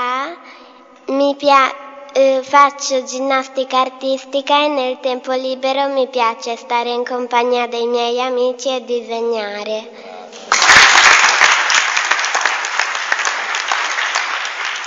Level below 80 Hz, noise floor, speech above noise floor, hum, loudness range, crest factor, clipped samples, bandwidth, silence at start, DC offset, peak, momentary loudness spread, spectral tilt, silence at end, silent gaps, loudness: -56 dBFS; -42 dBFS; 26 dB; none; 8 LU; 16 dB; under 0.1%; 11 kHz; 0 s; under 0.1%; 0 dBFS; 13 LU; 0 dB/octave; 0 s; none; -14 LUFS